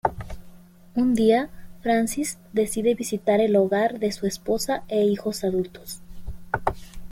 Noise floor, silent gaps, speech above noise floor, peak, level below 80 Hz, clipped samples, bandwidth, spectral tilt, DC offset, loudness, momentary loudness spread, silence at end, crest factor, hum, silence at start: -46 dBFS; none; 23 dB; -6 dBFS; -46 dBFS; under 0.1%; 16.5 kHz; -5 dB/octave; under 0.1%; -24 LUFS; 19 LU; 0 s; 18 dB; none; 0.05 s